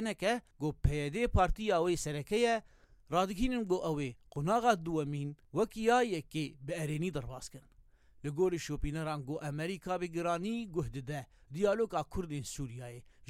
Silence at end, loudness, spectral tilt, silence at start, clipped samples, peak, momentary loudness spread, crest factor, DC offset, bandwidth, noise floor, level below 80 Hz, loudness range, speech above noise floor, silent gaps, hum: 0.25 s; -35 LUFS; -5.5 dB/octave; 0 s; under 0.1%; -14 dBFS; 11 LU; 20 dB; under 0.1%; 16 kHz; -61 dBFS; -46 dBFS; 5 LU; 27 dB; none; none